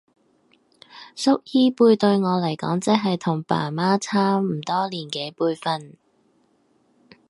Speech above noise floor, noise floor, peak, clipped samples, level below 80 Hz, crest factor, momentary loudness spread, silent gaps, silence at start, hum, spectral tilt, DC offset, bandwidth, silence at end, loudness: 42 dB; -63 dBFS; -2 dBFS; under 0.1%; -70 dBFS; 20 dB; 10 LU; none; 0.95 s; none; -6 dB/octave; under 0.1%; 11.5 kHz; 1.4 s; -22 LUFS